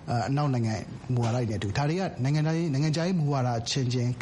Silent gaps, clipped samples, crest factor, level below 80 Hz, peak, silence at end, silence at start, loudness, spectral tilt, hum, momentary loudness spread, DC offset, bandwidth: none; under 0.1%; 12 dB; -54 dBFS; -16 dBFS; 0 s; 0 s; -28 LUFS; -6.5 dB/octave; none; 3 LU; under 0.1%; 10.5 kHz